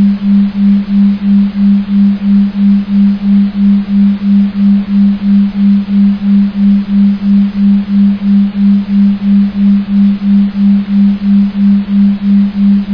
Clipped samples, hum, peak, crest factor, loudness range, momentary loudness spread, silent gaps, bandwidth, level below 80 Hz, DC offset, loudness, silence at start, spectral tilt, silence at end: under 0.1%; none; -2 dBFS; 8 dB; 0 LU; 1 LU; none; 5.2 kHz; -38 dBFS; under 0.1%; -9 LUFS; 0 s; -10.5 dB/octave; 0 s